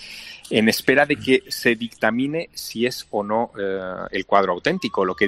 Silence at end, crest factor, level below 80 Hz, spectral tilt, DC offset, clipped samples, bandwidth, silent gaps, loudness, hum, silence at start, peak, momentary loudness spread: 0 s; 20 dB; -56 dBFS; -4.5 dB/octave; under 0.1%; under 0.1%; 16.5 kHz; none; -21 LUFS; none; 0 s; -2 dBFS; 10 LU